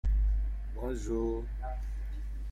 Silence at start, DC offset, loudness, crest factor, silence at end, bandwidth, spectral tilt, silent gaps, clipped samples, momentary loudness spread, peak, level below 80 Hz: 0.05 s; under 0.1%; -36 LUFS; 12 dB; 0 s; 7.8 kHz; -8 dB/octave; none; under 0.1%; 9 LU; -20 dBFS; -32 dBFS